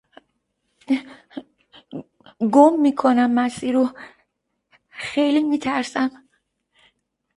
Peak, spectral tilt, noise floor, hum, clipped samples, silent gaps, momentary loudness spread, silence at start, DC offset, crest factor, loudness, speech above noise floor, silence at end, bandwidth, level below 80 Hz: 0 dBFS; -5 dB/octave; -73 dBFS; none; under 0.1%; none; 23 LU; 0.9 s; under 0.1%; 22 dB; -19 LUFS; 55 dB; 1.25 s; 11.5 kHz; -66 dBFS